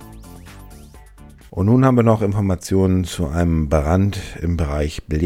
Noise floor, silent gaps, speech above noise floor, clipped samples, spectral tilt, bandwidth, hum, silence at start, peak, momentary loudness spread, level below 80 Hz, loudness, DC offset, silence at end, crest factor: -43 dBFS; none; 26 dB; under 0.1%; -7.5 dB/octave; 15.5 kHz; none; 0 s; 0 dBFS; 12 LU; -32 dBFS; -18 LUFS; under 0.1%; 0 s; 18 dB